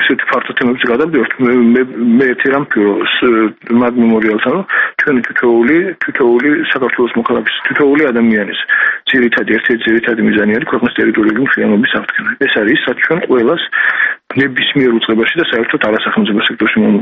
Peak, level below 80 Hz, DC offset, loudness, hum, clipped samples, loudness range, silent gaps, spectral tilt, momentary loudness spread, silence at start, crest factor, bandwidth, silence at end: 0 dBFS; -52 dBFS; under 0.1%; -12 LUFS; none; under 0.1%; 1 LU; none; -7.5 dB/octave; 3 LU; 0 s; 12 dB; 5.2 kHz; 0 s